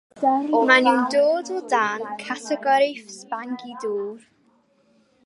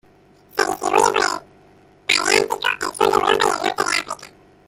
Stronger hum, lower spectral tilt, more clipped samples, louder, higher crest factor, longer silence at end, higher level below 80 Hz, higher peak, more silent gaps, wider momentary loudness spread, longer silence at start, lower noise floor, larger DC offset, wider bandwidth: neither; first, -3 dB/octave vs -1.5 dB/octave; neither; about the same, -21 LUFS vs -19 LUFS; about the same, 20 dB vs 18 dB; first, 1.05 s vs 0.4 s; second, -82 dBFS vs -54 dBFS; about the same, -2 dBFS vs -2 dBFS; neither; first, 16 LU vs 13 LU; second, 0.15 s vs 0.55 s; first, -62 dBFS vs -52 dBFS; neither; second, 11.5 kHz vs 16.5 kHz